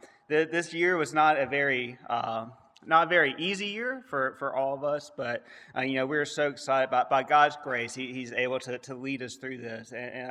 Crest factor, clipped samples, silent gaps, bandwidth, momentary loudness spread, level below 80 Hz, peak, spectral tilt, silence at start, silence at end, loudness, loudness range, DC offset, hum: 22 dB; under 0.1%; none; 12 kHz; 14 LU; -78 dBFS; -8 dBFS; -4 dB/octave; 0.05 s; 0 s; -28 LUFS; 4 LU; under 0.1%; none